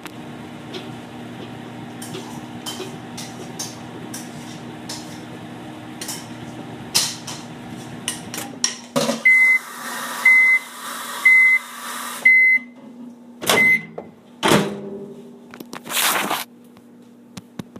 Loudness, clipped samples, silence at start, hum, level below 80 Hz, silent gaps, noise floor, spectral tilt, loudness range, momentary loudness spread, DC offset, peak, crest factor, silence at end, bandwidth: -16 LUFS; under 0.1%; 0 s; none; -64 dBFS; none; -46 dBFS; -2 dB/octave; 18 LU; 23 LU; under 0.1%; -2 dBFS; 20 dB; 0 s; 15.5 kHz